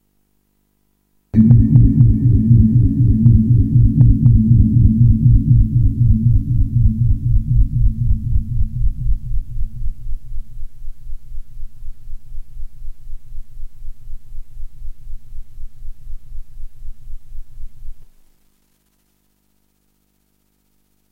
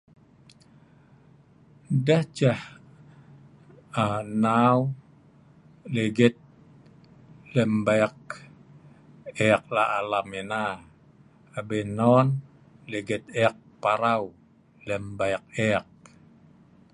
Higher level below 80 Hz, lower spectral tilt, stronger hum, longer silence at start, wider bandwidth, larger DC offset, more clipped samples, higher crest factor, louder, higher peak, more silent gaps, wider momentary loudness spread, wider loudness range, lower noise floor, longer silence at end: first, -22 dBFS vs -62 dBFS; first, -12.5 dB/octave vs -6.5 dB/octave; first, 50 Hz at -40 dBFS vs none; second, 1.35 s vs 1.9 s; second, 0.9 kHz vs 11.5 kHz; neither; neither; second, 16 dB vs 24 dB; first, -14 LUFS vs -25 LUFS; first, 0 dBFS vs -4 dBFS; neither; first, 25 LU vs 18 LU; first, 20 LU vs 3 LU; first, -63 dBFS vs -56 dBFS; first, 3.05 s vs 1.1 s